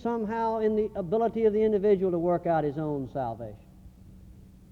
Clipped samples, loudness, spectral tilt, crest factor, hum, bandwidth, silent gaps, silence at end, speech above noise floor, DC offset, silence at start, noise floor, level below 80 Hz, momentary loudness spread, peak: under 0.1%; -27 LUFS; -9.5 dB/octave; 16 dB; none; 6.2 kHz; none; 0.3 s; 24 dB; under 0.1%; 0 s; -50 dBFS; -54 dBFS; 9 LU; -12 dBFS